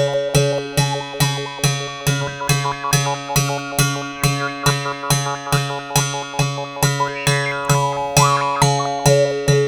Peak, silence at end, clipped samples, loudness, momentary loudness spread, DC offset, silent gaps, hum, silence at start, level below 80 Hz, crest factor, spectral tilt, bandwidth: 0 dBFS; 0 s; under 0.1%; -18 LUFS; 5 LU; under 0.1%; none; none; 0 s; -42 dBFS; 18 dB; -4 dB/octave; over 20 kHz